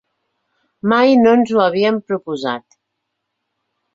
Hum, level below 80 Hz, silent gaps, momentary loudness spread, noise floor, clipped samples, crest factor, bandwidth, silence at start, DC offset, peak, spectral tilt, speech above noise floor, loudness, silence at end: none; -62 dBFS; none; 13 LU; -75 dBFS; under 0.1%; 16 dB; 7.6 kHz; 0.85 s; under 0.1%; -2 dBFS; -6.5 dB/octave; 61 dB; -15 LUFS; 1.35 s